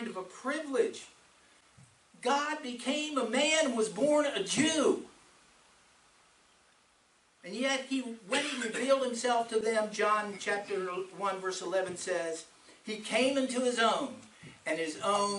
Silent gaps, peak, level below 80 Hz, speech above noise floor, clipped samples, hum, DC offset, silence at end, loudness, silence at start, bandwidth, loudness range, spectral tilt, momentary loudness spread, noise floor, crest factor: none; -14 dBFS; -78 dBFS; 36 dB; under 0.1%; none; under 0.1%; 0 s; -31 LUFS; 0 s; 11.5 kHz; 6 LU; -2.5 dB/octave; 12 LU; -67 dBFS; 20 dB